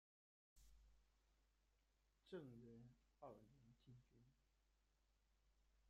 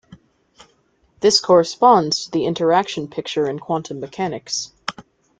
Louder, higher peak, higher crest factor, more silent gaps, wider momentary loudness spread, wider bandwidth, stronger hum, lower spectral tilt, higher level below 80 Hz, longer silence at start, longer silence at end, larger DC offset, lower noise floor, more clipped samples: second, -63 LUFS vs -18 LUFS; second, -44 dBFS vs -2 dBFS; about the same, 22 dB vs 18 dB; neither; second, 9 LU vs 13 LU; second, 7.2 kHz vs 9.4 kHz; neither; first, -6.5 dB/octave vs -4 dB/octave; second, -80 dBFS vs -60 dBFS; first, 0.55 s vs 0.1 s; second, 0 s vs 0.4 s; neither; first, -84 dBFS vs -61 dBFS; neither